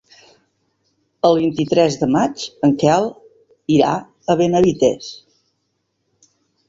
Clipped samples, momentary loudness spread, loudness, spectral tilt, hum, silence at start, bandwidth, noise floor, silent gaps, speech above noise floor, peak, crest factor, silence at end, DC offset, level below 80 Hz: under 0.1%; 10 LU; -17 LUFS; -6 dB/octave; none; 1.25 s; 7.8 kHz; -70 dBFS; none; 55 dB; -2 dBFS; 18 dB; 1.55 s; under 0.1%; -54 dBFS